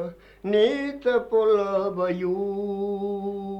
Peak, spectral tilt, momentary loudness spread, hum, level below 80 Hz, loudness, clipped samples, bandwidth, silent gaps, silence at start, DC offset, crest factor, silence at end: -10 dBFS; -7 dB/octave; 8 LU; none; -58 dBFS; -24 LUFS; under 0.1%; 7.8 kHz; none; 0 s; under 0.1%; 14 dB; 0 s